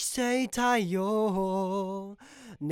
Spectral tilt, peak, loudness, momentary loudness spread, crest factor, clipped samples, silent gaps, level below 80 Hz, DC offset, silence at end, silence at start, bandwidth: -4.5 dB/octave; -14 dBFS; -29 LUFS; 17 LU; 14 dB; under 0.1%; none; -62 dBFS; under 0.1%; 0 s; 0 s; 17.5 kHz